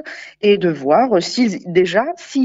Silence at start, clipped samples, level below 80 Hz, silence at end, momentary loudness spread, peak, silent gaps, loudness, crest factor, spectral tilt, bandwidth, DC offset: 0.05 s; under 0.1%; -64 dBFS; 0 s; 5 LU; -2 dBFS; none; -16 LUFS; 16 dB; -5.5 dB/octave; 8 kHz; under 0.1%